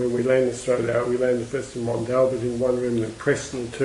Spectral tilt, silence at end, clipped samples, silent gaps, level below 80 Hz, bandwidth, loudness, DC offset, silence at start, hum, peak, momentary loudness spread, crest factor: -6 dB/octave; 0 s; under 0.1%; none; -50 dBFS; 11.5 kHz; -23 LUFS; under 0.1%; 0 s; none; -6 dBFS; 7 LU; 16 dB